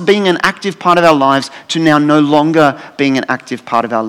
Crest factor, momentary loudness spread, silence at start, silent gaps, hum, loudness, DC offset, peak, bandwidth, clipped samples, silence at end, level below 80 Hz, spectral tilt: 12 dB; 8 LU; 0 s; none; none; -12 LUFS; under 0.1%; 0 dBFS; 14.5 kHz; 0.6%; 0 s; -54 dBFS; -5.5 dB/octave